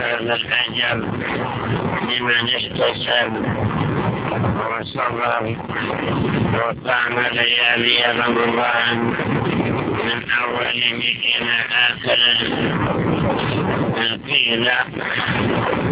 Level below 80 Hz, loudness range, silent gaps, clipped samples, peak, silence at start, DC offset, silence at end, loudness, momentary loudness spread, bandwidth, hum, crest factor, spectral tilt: -44 dBFS; 4 LU; none; under 0.1%; -2 dBFS; 0 s; under 0.1%; 0 s; -18 LUFS; 7 LU; 4 kHz; none; 18 dB; -8.5 dB/octave